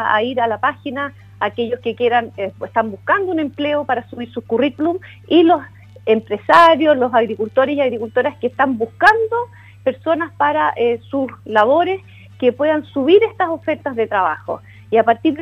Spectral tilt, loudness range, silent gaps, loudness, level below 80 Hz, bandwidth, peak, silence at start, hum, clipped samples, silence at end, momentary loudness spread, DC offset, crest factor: -6 dB/octave; 5 LU; none; -17 LUFS; -58 dBFS; 10.5 kHz; 0 dBFS; 0 s; none; under 0.1%; 0 s; 11 LU; under 0.1%; 16 dB